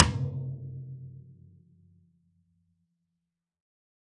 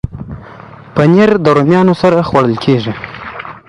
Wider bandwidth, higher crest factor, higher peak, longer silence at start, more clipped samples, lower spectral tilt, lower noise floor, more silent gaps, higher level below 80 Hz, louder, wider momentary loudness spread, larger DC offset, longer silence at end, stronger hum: second, 9 kHz vs 10.5 kHz; first, 34 dB vs 12 dB; about the same, -2 dBFS vs 0 dBFS; about the same, 0 s vs 0.05 s; neither; second, -6 dB/octave vs -8 dB/octave; first, -85 dBFS vs -33 dBFS; neither; second, -52 dBFS vs -38 dBFS; second, -33 LUFS vs -10 LUFS; first, 23 LU vs 17 LU; neither; first, 2.8 s vs 0.1 s; neither